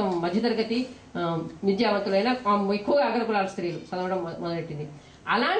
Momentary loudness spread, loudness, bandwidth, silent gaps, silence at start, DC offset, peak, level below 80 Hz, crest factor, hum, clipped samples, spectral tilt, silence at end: 9 LU; -26 LUFS; 9.6 kHz; none; 0 s; under 0.1%; -12 dBFS; -62 dBFS; 14 dB; none; under 0.1%; -6.5 dB/octave; 0 s